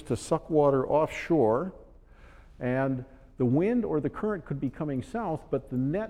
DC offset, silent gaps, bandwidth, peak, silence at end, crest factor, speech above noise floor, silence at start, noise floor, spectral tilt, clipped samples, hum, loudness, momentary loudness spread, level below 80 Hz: under 0.1%; none; 12 kHz; -12 dBFS; 0 s; 16 dB; 25 dB; 0 s; -52 dBFS; -8 dB/octave; under 0.1%; none; -28 LUFS; 9 LU; -52 dBFS